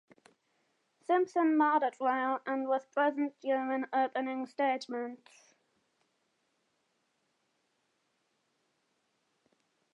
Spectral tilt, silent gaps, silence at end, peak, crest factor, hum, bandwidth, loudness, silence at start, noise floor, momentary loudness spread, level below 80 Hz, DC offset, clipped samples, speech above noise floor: -4.5 dB/octave; none; 4.75 s; -16 dBFS; 20 dB; none; 9.4 kHz; -32 LUFS; 1.1 s; -78 dBFS; 9 LU; under -90 dBFS; under 0.1%; under 0.1%; 47 dB